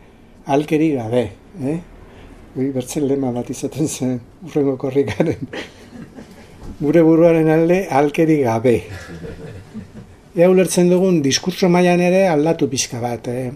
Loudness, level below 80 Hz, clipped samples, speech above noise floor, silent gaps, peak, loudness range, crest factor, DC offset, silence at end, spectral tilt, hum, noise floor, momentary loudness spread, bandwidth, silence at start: -17 LUFS; -46 dBFS; under 0.1%; 24 dB; none; 0 dBFS; 7 LU; 18 dB; under 0.1%; 0 s; -6 dB/octave; none; -40 dBFS; 20 LU; 14.5 kHz; 0.45 s